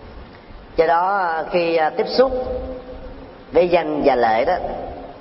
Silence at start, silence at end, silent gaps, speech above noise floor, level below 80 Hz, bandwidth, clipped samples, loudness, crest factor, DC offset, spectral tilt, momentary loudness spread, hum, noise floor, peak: 0 s; 0 s; none; 22 dB; -40 dBFS; 5.8 kHz; under 0.1%; -19 LUFS; 16 dB; under 0.1%; -9.5 dB/octave; 19 LU; none; -40 dBFS; -4 dBFS